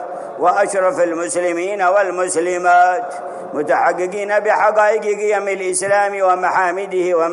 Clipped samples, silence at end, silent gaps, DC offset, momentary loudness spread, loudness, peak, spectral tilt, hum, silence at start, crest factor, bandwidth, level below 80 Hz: under 0.1%; 0 s; none; under 0.1%; 7 LU; -16 LUFS; -2 dBFS; -3.5 dB/octave; none; 0 s; 14 dB; 11.5 kHz; -70 dBFS